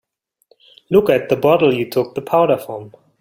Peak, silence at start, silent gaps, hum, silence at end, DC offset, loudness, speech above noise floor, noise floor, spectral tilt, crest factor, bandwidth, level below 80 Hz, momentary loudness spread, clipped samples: 0 dBFS; 0.9 s; none; none; 0.35 s; under 0.1%; -16 LUFS; 43 dB; -59 dBFS; -7 dB/octave; 16 dB; 16.5 kHz; -56 dBFS; 8 LU; under 0.1%